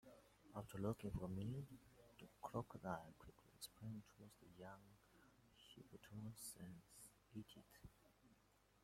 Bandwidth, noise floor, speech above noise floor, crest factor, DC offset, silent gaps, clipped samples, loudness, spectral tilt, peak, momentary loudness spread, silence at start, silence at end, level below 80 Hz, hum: 16.5 kHz; -77 dBFS; 24 dB; 24 dB; under 0.1%; none; under 0.1%; -54 LUFS; -6 dB/octave; -32 dBFS; 18 LU; 0.05 s; 0.05 s; -72 dBFS; none